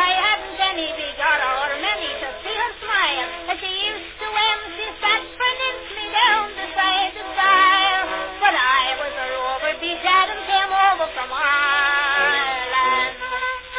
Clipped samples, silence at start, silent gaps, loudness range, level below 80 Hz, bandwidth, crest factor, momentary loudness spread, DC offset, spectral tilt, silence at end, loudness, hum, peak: under 0.1%; 0 s; none; 4 LU; -50 dBFS; 4 kHz; 18 dB; 8 LU; under 0.1%; -4.5 dB/octave; 0 s; -19 LUFS; none; -4 dBFS